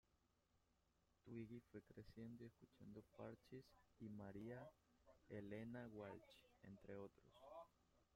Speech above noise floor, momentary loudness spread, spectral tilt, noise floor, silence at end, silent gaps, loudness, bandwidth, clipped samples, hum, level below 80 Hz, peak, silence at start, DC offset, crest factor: 26 dB; 9 LU; -7.5 dB/octave; -85 dBFS; 0.1 s; none; -60 LUFS; 16 kHz; under 0.1%; none; -82 dBFS; -42 dBFS; 0.55 s; under 0.1%; 20 dB